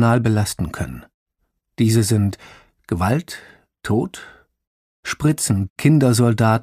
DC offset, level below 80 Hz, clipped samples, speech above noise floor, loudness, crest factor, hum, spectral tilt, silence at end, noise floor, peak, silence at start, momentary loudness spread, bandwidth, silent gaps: under 0.1%; -44 dBFS; under 0.1%; 55 dB; -19 LUFS; 18 dB; none; -6 dB/octave; 0 s; -73 dBFS; -2 dBFS; 0 s; 19 LU; 15.5 kHz; 1.14-1.26 s, 4.67-5.03 s, 5.70-5.76 s